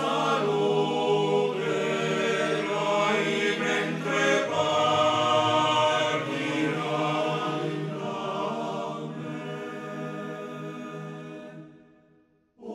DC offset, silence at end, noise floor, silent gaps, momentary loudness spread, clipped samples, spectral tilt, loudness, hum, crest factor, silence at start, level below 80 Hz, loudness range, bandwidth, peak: under 0.1%; 0 s; -63 dBFS; none; 14 LU; under 0.1%; -4.5 dB/octave; -26 LUFS; none; 16 dB; 0 s; -72 dBFS; 12 LU; 13.5 kHz; -12 dBFS